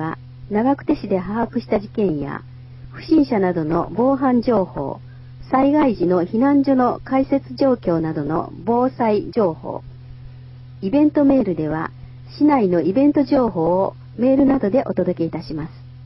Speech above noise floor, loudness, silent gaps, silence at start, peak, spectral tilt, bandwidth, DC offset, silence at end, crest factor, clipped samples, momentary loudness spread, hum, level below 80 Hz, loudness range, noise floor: 20 dB; -19 LUFS; none; 0 s; -2 dBFS; -11 dB/octave; 5.8 kHz; under 0.1%; 0 s; 16 dB; under 0.1%; 15 LU; none; -46 dBFS; 3 LU; -38 dBFS